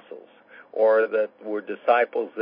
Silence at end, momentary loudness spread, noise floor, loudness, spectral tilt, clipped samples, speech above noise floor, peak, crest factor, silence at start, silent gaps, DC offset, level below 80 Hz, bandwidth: 0 s; 12 LU; -50 dBFS; -23 LUFS; -8 dB/octave; under 0.1%; 28 dB; -6 dBFS; 18 dB; 0.1 s; none; under 0.1%; -84 dBFS; 5.2 kHz